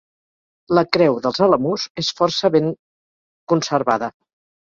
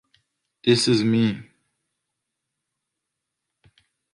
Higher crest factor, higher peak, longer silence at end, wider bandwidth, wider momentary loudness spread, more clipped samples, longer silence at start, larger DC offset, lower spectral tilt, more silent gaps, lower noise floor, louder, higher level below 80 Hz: about the same, 20 dB vs 20 dB; first, 0 dBFS vs -6 dBFS; second, 0.6 s vs 2.7 s; second, 7.6 kHz vs 11.5 kHz; about the same, 7 LU vs 8 LU; neither; about the same, 0.7 s vs 0.65 s; neither; about the same, -5 dB/octave vs -5 dB/octave; first, 1.90-1.95 s, 2.79-3.47 s vs none; first, under -90 dBFS vs -82 dBFS; first, -18 LUFS vs -21 LUFS; first, -58 dBFS vs -64 dBFS